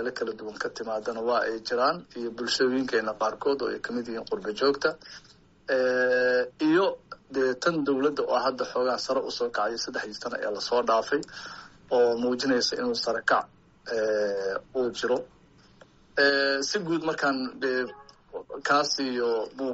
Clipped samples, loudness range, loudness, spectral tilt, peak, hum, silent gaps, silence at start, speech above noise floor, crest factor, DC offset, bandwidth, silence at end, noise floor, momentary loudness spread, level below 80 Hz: under 0.1%; 2 LU; -27 LUFS; -1.5 dB/octave; -10 dBFS; none; none; 0 s; 29 dB; 18 dB; under 0.1%; 8 kHz; 0 s; -56 dBFS; 10 LU; -66 dBFS